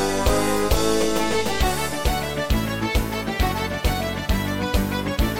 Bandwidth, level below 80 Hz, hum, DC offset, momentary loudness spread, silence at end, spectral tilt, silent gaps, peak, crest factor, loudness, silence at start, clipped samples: 17 kHz; -28 dBFS; none; under 0.1%; 4 LU; 0 s; -4.5 dB/octave; none; -6 dBFS; 16 dB; -23 LUFS; 0 s; under 0.1%